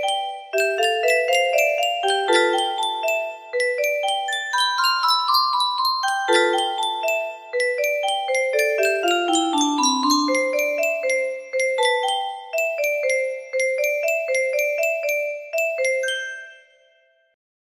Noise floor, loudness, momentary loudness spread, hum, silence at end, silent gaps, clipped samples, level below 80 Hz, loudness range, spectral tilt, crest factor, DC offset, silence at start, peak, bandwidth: -60 dBFS; -20 LUFS; 6 LU; none; 1.1 s; none; under 0.1%; -74 dBFS; 2 LU; 0.5 dB/octave; 18 dB; under 0.1%; 0 s; -4 dBFS; 15.5 kHz